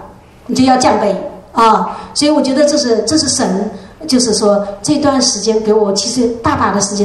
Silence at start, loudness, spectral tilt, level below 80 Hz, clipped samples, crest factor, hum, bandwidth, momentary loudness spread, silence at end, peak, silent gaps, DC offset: 0 s; -12 LUFS; -3.5 dB/octave; -44 dBFS; under 0.1%; 12 dB; none; 12.5 kHz; 7 LU; 0 s; 0 dBFS; none; under 0.1%